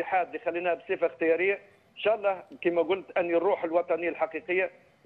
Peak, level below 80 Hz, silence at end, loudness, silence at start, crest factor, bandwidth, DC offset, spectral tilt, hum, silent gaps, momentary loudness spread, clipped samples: -12 dBFS; -72 dBFS; 0.35 s; -28 LUFS; 0 s; 16 dB; 4.3 kHz; under 0.1%; -7 dB/octave; none; none; 5 LU; under 0.1%